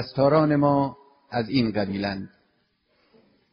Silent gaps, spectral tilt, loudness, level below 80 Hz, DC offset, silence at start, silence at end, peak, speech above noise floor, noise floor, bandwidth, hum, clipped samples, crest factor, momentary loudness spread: none; -6 dB/octave; -23 LUFS; -56 dBFS; under 0.1%; 0 s; 1.25 s; -6 dBFS; 46 dB; -69 dBFS; 5.6 kHz; none; under 0.1%; 18 dB; 12 LU